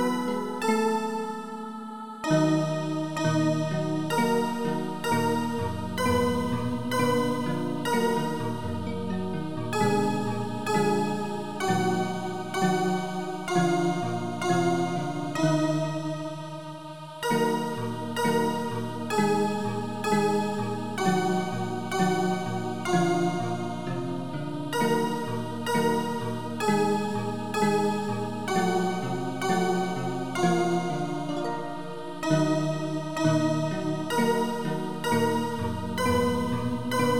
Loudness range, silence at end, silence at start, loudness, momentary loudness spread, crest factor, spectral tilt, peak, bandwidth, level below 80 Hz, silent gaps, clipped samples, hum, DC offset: 2 LU; 0 s; 0 s; -27 LUFS; 7 LU; 16 dB; -5.5 dB/octave; -10 dBFS; 18.5 kHz; -60 dBFS; none; under 0.1%; none; 0.7%